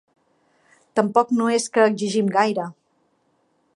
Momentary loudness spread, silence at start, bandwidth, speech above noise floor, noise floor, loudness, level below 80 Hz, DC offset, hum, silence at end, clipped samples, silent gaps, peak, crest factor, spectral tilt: 8 LU; 0.95 s; 11.5 kHz; 47 dB; -66 dBFS; -20 LUFS; -74 dBFS; under 0.1%; none; 1.05 s; under 0.1%; none; -2 dBFS; 20 dB; -5 dB/octave